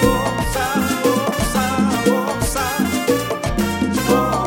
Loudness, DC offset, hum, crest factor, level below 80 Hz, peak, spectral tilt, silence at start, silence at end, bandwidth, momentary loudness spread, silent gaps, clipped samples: -18 LUFS; under 0.1%; none; 16 dB; -32 dBFS; -2 dBFS; -4.5 dB/octave; 0 s; 0 s; 17 kHz; 4 LU; none; under 0.1%